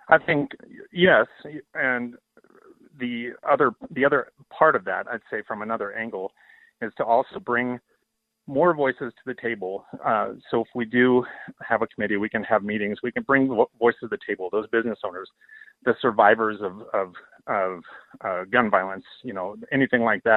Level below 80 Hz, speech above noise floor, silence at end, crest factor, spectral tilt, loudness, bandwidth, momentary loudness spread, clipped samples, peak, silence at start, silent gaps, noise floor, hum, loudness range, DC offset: -66 dBFS; 53 dB; 0 s; 24 dB; -8.5 dB/octave; -24 LUFS; 4.3 kHz; 15 LU; under 0.1%; -2 dBFS; 0.1 s; none; -77 dBFS; none; 3 LU; under 0.1%